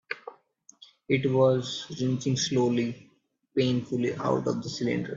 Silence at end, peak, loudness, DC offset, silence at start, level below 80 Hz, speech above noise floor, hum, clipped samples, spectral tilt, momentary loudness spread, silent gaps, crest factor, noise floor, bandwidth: 0 s; -10 dBFS; -27 LUFS; under 0.1%; 0.1 s; -66 dBFS; 32 dB; none; under 0.1%; -5.5 dB/octave; 11 LU; none; 18 dB; -59 dBFS; 7.6 kHz